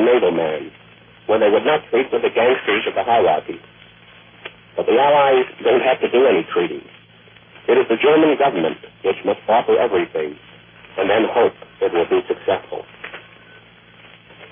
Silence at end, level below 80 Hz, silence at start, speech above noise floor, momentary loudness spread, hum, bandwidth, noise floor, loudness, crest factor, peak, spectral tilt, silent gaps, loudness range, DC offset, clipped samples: 1.3 s; -60 dBFS; 0 s; 30 dB; 19 LU; none; 3.7 kHz; -47 dBFS; -17 LUFS; 14 dB; -4 dBFS; -9 dB/octave; none; 4 LU; under 0.1%; under 0.1%